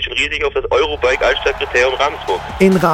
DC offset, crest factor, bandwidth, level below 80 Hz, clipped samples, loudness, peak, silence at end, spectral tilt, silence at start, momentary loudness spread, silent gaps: under 0.1%; 14 dB; 16.5 kHz; -34 dBFS; under 0.1%; -15 LUFS; 0 dBFS; 0 s; -4.5 dB/octave; 0 s; 4 LU; none